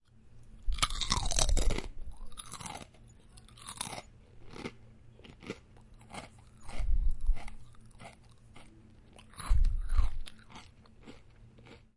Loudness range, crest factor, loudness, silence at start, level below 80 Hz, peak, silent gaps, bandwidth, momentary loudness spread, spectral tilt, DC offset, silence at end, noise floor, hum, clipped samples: 11 LU; 24 dB; -37 LUFS; 0.25 s; -36 dBFS; -8 dBFS; none; 11.5 kHz; 26 LU; -3 dB/octave; under 0.1%; 0.2 s; -56 dBFS; none; under 0.1%